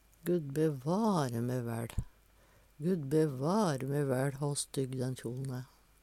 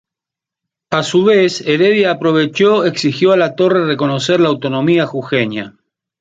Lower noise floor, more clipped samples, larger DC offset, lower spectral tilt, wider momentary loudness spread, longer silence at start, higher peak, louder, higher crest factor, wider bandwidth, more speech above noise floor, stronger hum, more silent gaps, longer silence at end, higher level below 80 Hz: second, -64 dBFS vs -85 dBFS; neither; neither; about the same, -6.5 dB/octave vs -5.5 dB/octave; first, 10 LU vs 5 LU; second, 0.25 s vs 0.9 s; second, -18 dBFS vs -2 dBFS; second, -34 LUFS vs -13 LUFS; about the same, 16 dB vs 12 dB; first, 16 kHz vs 9 kHz; second, 31 dB vs 72 dB; neither; neither; second, 0.35 s vs 0.5 s; about the same, -54 dBFS vs -58 dBFS